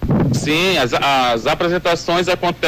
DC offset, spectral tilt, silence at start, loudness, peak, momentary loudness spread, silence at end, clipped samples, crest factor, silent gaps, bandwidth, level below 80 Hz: under 0.1%; -5 dB/octave; 0 s; -16 LUFS; -10 dBFS; 3 LU; 0 s; under 0.1%; 8 dB; none; 16 kHz; -36 dBFS